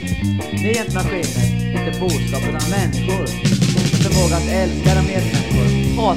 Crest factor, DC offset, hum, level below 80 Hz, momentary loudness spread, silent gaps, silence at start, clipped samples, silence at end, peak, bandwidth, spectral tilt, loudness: 16 dB; 1%; none; -28 dBFS; 5 LU; none; 0 s; under 0.1%; 0 s; -2 dBFS; 16 kHz; -5.5 dB/octave; -18 LUFS